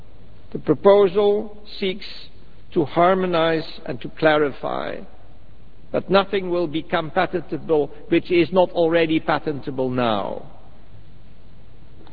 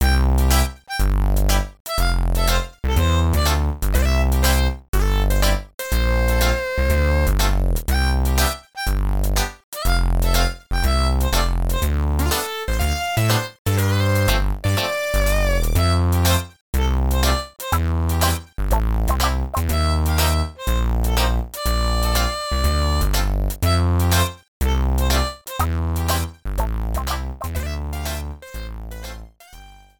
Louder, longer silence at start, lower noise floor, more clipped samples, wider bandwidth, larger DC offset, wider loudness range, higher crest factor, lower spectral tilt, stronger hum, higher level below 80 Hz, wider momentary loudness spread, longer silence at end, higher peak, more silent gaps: about the same, -21 LUFS vs -21 LUFS; first, 0.5 s vs 0 s; first, -48 dBFS vs -43 dBFS; neither; second, 5 kHz vs 19.5 kHz; first, 3% vs under 0.1%; about the same, 3 LU vs 3 LU; first, 22 dB vs 16 dB; first, -9 dB/octave vs -4.5 dB/octave; neither; second, -50 dBFS vs -22 dBFS; first, 14 LU vs 8 LU; first, 1.15 s vs 0.3 s; about the same, 0 dBFS vs -2 dBFS; second, none vs 1.80-1.85 s, 4.88-4.93 s, 5.74-5.78 s, 9.64-9.72 s, 13.59-13.65 s, 16.61-16.73 s, 24.48-24.60 s